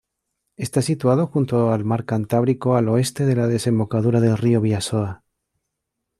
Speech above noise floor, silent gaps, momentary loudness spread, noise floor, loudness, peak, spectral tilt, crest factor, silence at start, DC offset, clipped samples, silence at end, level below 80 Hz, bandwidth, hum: 60 dB; none; 6 LU; -79 dBFS; -20 LUFS; -6 dBFS; -7 dB/octave; 14 dB; 0.6 s; under 0.1%; under 0.1%; 1.05 s; -56 dBFS; 13.5 kHz; none